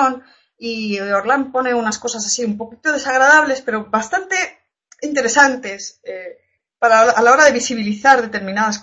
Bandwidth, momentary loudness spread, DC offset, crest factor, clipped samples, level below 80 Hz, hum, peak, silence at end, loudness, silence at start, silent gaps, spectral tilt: 8.6 kHz; 18 LU; under 0.1%; 16 dB; under 0.1%; -60 dBFS; none; 0 dBFS; 0 s; -15 LUFS; 0 s; none; -2.5 dB/octave